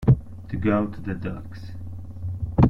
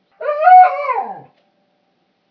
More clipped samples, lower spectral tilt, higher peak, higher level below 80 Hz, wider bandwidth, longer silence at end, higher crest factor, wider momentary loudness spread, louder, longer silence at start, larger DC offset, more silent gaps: neither; first, -10.5 dB/octave vs -5 dB/octave; second, -6 dBFS vs 0 dBFS; first, -36 dBFS vs -82 dBFS; first, 5.6 kHz vs 4.9 kHz; second, 0 s vs 1.1 s; about the same, 18 dB vs 14 dB; about the same, 15 LU vs 15 LU; second, -27 LUFS vs -12 LUFS; second, 0 s vs 0.2 s; neither; neither